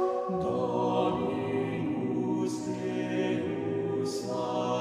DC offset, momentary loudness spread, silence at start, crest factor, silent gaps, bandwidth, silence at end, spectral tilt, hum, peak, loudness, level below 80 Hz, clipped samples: under 0.1%; 4 LU; 0 s; 16 dB; none; 13 kHz; 0 s; -6.5 dB/octave; none; -14 dBFS; -31 LUFS; -64 dBFS; under 0.1%